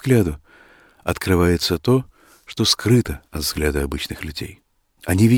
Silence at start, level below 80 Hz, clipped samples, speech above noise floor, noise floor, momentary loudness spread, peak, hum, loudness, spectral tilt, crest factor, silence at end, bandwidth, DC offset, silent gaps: 0.05 s; -36 dBFS; under 0.1%; 32 dB; -50 dBFS; 16 LU; -2 dBFS; none; -20 LUFS; -5 dB/octave; 18 dB; 0 s; 18.5 kHz; under 0.1%; none